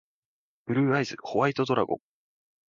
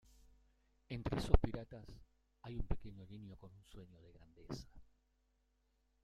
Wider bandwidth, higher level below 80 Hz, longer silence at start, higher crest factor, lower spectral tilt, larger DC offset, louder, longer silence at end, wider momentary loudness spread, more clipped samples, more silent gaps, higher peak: second, 7.4 kHz vs 10.5 kHz; second, -68 dBFS vs -46 dBFS; second, 0.65 s vs 0.9 s; second, 20 dB vs 32 dB; about the same, -6.5 dB/octave vs -7 dB/octave; neither; first, -27 LUFS vs -43 LUFS; second, 0.7 s vs 1.2 s; second, 8 LU vs 26 LU; neither; neither; about the same, -10 dBFS vs -10 dBFS